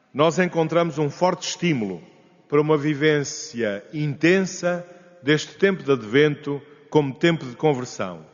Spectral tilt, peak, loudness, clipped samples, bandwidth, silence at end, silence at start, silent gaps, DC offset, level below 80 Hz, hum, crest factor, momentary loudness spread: -5 dB/octave; -4 dBFS; -22 LUFS; under 0.1%; 7.4 kHz; 0.1 s; 0.15 s; none; under 0.1%; -66 dBFS; none; 18 dB; 10 LU